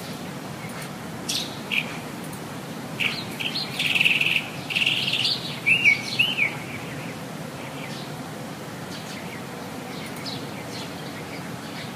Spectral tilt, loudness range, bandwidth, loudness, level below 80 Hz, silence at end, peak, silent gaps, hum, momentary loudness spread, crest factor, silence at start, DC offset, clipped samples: -3 dB/octave; 13 LU; 15.5 kHz; -25 LUFS; -62 dBFS; 0 s; -6 dBFS; none; none; 16 LU; 22 dB; 0 s; under 0.1%; under 0.1%